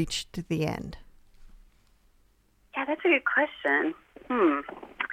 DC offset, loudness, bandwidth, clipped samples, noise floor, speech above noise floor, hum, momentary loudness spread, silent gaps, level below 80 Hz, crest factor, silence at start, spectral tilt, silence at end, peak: under 0.1%; -27 LUFS; 15 kHz; under 0.1%; -65 dBFS; 37 dB; none; 14 LU; none; -54 dBFS; 20 dB; 0 s; -5 dB/octave; 0 s; -10 dBFS